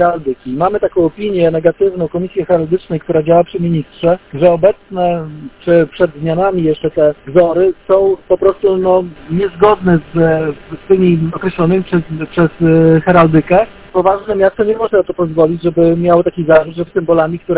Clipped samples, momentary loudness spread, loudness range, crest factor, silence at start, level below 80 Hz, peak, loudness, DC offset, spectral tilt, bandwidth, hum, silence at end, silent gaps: 0.2%; 8 LU; 2 LU; 12 dB; 0 s; -40 dBFS; 0 dBFS; -13 LUFS; under 0.1%; -12 dB/octave; 4 kHz; none; 0 s; none